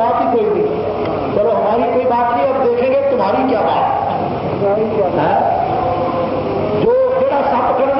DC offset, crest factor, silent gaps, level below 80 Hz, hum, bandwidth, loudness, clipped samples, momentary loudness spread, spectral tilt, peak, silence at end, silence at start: under 0.1%; 10 dB; none; -44 dBFS; none; 5.8 kHz; -15 LUFS; under 0.1%; 4 LU; -12 dB/octave; -4 dBFS; 0 s; 0 s